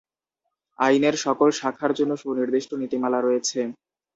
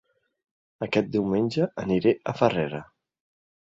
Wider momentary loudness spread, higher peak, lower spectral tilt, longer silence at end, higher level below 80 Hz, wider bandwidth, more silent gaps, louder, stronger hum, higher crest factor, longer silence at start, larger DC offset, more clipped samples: about the same, 6 LU vs 8 LU; about the same, -6 dBFS vs -6 dBFS; second, -4 dB/octave vs -7.5 dB/octave; second, 0.4 s vs 0.95 s; second, -70 dBFS vs -58 dBFS; about the same, 8 kHz vs 7.8 kHz; neither; about the same, -23 LUFS vs -25 LUFS; neither; about the same, 18 dB vs 20 dB; about the same, 0.8 s vs 0.8 s; neither; neither